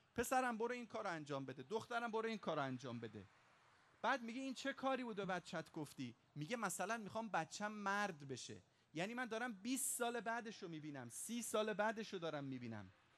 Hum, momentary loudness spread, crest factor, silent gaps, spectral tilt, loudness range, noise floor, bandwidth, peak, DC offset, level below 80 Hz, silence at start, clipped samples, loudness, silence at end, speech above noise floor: none; 11 LU; 18 dB; none; -3.5 dB/octave; 2 LU; -72 dBFS; 13 kHz; -28 dBFS; under 0.1%; -80 dBFS; 0.15 s; under 0.1%; -45 LUFS; 0.25 s; 27 dB